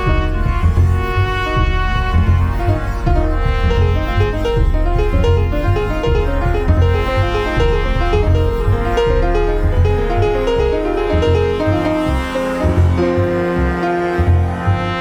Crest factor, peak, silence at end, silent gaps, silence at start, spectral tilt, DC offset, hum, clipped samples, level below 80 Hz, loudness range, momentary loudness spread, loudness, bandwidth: 12 dB; -2 dBFS; 0 s; none; 0 s; -7.5 dB/octave; under 0.1%; none; under 0.1%; -18 dBFS; 1 LU; 3 LU; -16 LUFS; 9.8 kHz